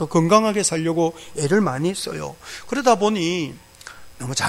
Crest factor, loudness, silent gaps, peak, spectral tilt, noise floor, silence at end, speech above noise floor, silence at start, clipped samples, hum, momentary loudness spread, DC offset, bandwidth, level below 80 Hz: 20 dB; -20 LUFS; none; 0 dBFS; -4.5 dB/octave; -41 dBFS; 0 s; 21 dB; 0 s; under 0.1%; none; 20 LU; under 0.1%; 16 kHz; -54 dBFS